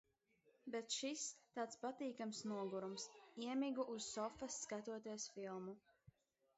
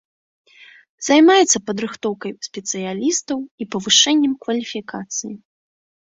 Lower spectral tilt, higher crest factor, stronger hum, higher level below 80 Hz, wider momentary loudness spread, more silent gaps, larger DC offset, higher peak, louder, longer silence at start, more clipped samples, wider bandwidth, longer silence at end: first, -3.5 dB/octave vs -2 dB/octave; about the same, 18 dB vs 20 dB; neither; second, -84 dBFS vs -66 dBFS; second, 8 LU vs 16 LU; second, none vs 3.51-3.58 s; neither; second, -32 dBFS vs 0 dBFS; second, -48 LUFS vs -18 LUFS; second, 0.65 s vs 1 s; neither; about the same, 8 kHz vs 8.4 kHz; second, 0.5 s vs 0.8 s